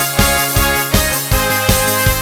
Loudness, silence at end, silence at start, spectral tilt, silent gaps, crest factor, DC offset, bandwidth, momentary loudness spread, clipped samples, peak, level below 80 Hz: -13 LUFS; 0 s; 0 s; -3 dB/octave; none; 14 dB; under 0.1%; 19 kHz; 2 LU; under 0.1%; 0 dBFS; -22 dBFS